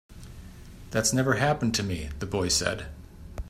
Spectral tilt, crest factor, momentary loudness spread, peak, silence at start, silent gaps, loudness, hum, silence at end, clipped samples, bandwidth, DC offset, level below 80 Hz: -3.5 dB/octave; 20 dB; 23 LU; -10 dBFS; 0.1 s; none; -26 LUFS; none; 0 s; under 0.1%; 16 kHz; under 0.1%; -44 dBFS